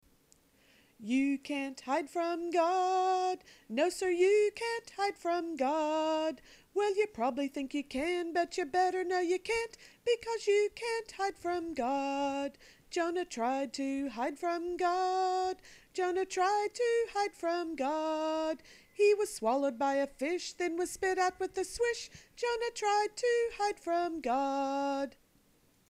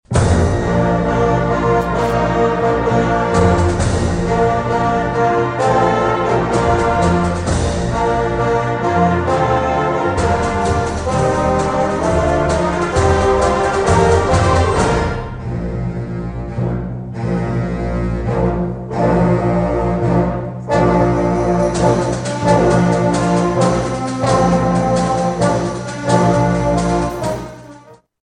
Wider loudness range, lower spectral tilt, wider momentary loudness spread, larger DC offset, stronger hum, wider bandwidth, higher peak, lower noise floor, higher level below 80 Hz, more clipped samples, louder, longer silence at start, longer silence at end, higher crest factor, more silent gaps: about the same, 3 LU vs 3 LU; second, -3 dB/octave vs -6.5 dB/octave; about the same, 8 LU vs 7 LU; neither; neither; first, 15.5 kHz vs 10.5 kHz; second, -18 dBFS vs 0 dBFS; first, -68 dBFS vs -42 dBFS; second, -66 dBFS vs -28 dBFS; neither; second, -33 LUFS vs -16 LUFS; first, 1 s vs 0.1 s; first, 0.8 s vs 0.35 s; about the same, 16 dB vs 14 dB; neither